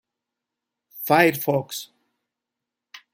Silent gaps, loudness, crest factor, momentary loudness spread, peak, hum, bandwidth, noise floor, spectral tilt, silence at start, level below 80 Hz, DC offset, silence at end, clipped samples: none; -20 LUFS; 22 dB; 16 LU; -4 dBFS; none; 16.5 kHz; -85 dBFS; -5 dB/octave; 0.95 s; -72 dBFS; under 0.1%; 0.15 s; under 0.1%